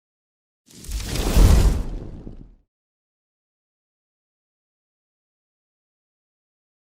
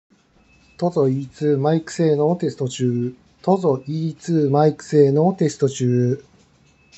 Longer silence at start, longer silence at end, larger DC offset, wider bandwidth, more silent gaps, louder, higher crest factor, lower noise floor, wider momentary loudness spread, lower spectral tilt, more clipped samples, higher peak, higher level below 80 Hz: about the same, 0.85 s vs 0.8 s; first, 4.45 s vs 0.75 s; neither; first, 16.5 kHz vs 8.4 kHz; neither; about the same, -20 LUFS vs -20 LUFS; about the same, 22 dB vs 18 dB; second, -40 dBFS vs -56 dBFS; first, 24 LU vs 9 LU; second, -5.5 dB/octave vs -7.5 dB/octave; neither; about the same, -2 dBFS vs -2 dBFS; first, -26 dBFS vs -62 dBFS